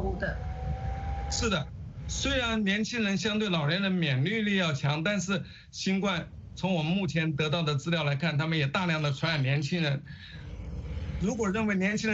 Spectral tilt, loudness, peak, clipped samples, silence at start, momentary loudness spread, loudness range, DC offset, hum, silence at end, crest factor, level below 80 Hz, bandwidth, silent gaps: -5 dB/octave; -29 LUFS; -14 dBFS; under 0.1%; 0 s; 10 LU; 2 LU; under 0.1%; none; 0 s; 16 dB; -42 dBFS; 8 kHz; none